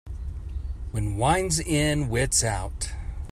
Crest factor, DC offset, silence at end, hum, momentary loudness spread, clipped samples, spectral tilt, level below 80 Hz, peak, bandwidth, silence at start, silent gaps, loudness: 18 dB; under 0.1%; 0 s; none; 14 LU; under 0.1%; -4 dB/octave; -34 dBFS; -8 dBFS; 15.5 kHz; 0.05 s; none; -25 LUFS